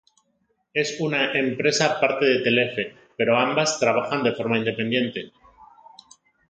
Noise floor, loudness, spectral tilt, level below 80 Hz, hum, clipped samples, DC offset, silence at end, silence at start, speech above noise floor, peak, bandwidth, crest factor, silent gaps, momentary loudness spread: -70 dBFS; -22 LUFS; -4 dB/octave; -68 dBFS; none; under 0.1%; under 0.1%; 0.85 s; 0.75 s; 48 dB; -6 dBFS; 9.4 kHz; 18 dB; none; 9 LU